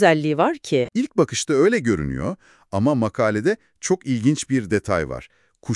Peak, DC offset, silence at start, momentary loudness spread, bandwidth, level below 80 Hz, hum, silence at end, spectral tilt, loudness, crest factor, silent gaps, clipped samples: -2 dBFS; under 0.1%; 0 s; 11 LU; 12 kHz; -48 dBFS; none; 0 s; -5.5 dB/octave; -21 LUFS; 20 dB; none; under 0.1%